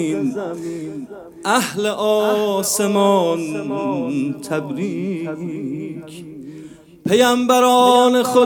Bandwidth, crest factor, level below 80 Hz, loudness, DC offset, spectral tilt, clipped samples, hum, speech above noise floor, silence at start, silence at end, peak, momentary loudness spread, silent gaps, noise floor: over 20 kHz; 18 dB; -64 dBFS; -18 LUFS; under 0.1%; -4 dB/octave; under 0.1%; none; 21 dB; 0 s; 0 s; 0 dBFS; 19 LU; none; -39 dBFS